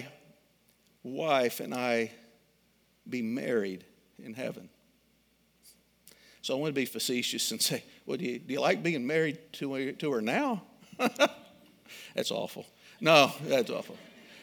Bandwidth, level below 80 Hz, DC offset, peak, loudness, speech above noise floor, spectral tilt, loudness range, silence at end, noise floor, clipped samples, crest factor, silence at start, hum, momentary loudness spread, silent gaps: over 20 kHz; -80 dBFS; under 0.1%; -4 dBFS; -30 LUFS; 38 dB; -3.5 dB/octave; 9 LU; 0 s; -69 dBFS; under 0.1%; 28 dB; 0 s; none; 20 LU; none